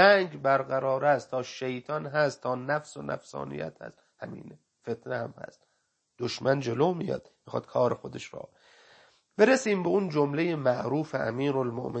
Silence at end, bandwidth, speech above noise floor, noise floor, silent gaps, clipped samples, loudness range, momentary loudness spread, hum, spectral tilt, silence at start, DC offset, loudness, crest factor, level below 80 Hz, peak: 0 s; 8.8 kHz; 47 dB; -75 dBFS; none; under 0.1%; 9 LU; 18 LU; none; -5.5 dB/octave; 0 s; under 0.1%; -28 LUFS; 22 dB; -70 dBFS; -6 dBFS